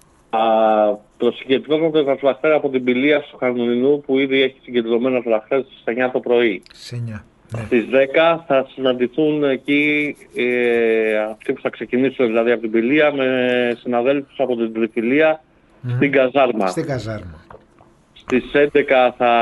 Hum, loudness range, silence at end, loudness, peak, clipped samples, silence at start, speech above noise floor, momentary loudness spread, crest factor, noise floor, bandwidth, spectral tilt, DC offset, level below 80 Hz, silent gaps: none; 2 LU; 0 s; -18 LUFS; -2 dBFS; under 0.1%; 0.35 s; 34 dB; 9 LU; 16 dB; -51 dBFS; 12 kHz; -6.5 dB/octave; under 0.1%; -56 dBFS; none